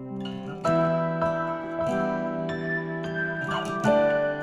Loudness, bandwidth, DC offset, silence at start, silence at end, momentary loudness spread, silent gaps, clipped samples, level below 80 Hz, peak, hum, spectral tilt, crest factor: -27 LUFS; 11.5 kHz; under 0.1%; 0 s; 0 s; 8 LU; none; under 0.1%; -56 dBFS; -10 dBFS; none; -6.5 dB/octave; 16 dB